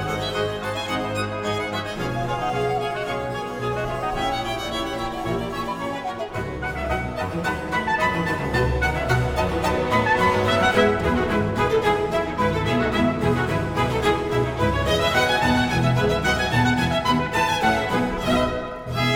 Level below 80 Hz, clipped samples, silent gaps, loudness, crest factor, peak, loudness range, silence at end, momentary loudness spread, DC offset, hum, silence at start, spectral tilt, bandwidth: -36 dBFS; under 0.1%; none; -22 LUFS; 18 dB; -6 dBFS; 6 LU; 0 s; 8 LU; under 0.1%; none; 0 s; -5.5 dB/octave; 18.5 kHz